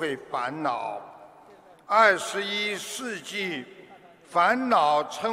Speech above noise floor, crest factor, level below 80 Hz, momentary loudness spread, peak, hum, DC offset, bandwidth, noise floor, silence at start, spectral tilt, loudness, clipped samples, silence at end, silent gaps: 27 dB; 22 dB; -74 dBFS; 13 LU; -6 dBFS; none; under 0.1%; 16 kHz; -52 dBFS; 0 s; -3 dB/octave; -25 LUFS; under 0.1%; 0 s; none